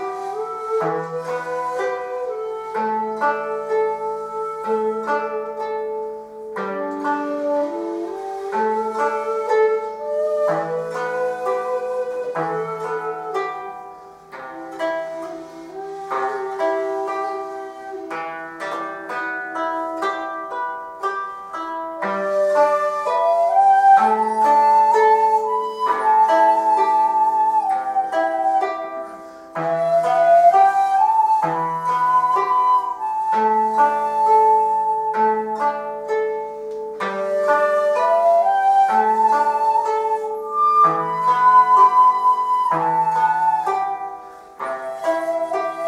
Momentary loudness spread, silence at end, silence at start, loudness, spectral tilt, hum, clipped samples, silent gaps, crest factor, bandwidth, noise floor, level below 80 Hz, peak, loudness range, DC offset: 14 LU; 0 s; 0 s; -19 LUFS; -5 dB/octave; none; under 0.1%; none; 16 dB; 13 kHz; -40 dBFS; -68 dBFS; -4 dBFS; 10 LU; under 0.1%